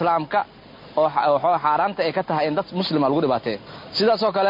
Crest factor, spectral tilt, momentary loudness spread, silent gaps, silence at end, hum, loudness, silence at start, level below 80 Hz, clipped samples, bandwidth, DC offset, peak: 14 dB; -7 dB/octave; 9 LU; none; 0 s; none; -21 LUFS; 0 s; -60 dBFS; under 0.1%; 5.4 kHz; under 0.1%; -8 dBFS